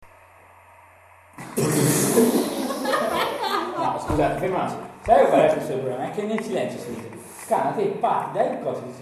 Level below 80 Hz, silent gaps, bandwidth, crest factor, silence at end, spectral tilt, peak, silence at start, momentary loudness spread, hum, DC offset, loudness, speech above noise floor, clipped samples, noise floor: -48 dBFS; none; 14 kHz; 18 dB; 0 s; -4.5 dB/octave; -4 dBFS; 0 s; 13 LU; none; under 0.1%; -23 LUFS; 28 dB; under 0.1%; -51 dBFS